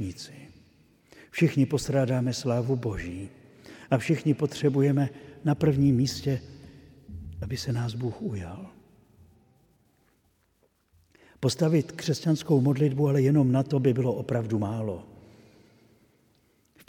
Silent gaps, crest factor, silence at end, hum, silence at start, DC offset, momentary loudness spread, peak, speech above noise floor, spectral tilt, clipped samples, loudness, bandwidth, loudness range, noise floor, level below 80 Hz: none; 20 dB; 1.8 s; none; 0 s; under 0.1%; 18 LU; -8 dBFS; 43 dB; -7 dB/octave; under 0.1%; -26 LUFS; 15.5 kHz; 11 LU; -69 dBFS; -54 dBFS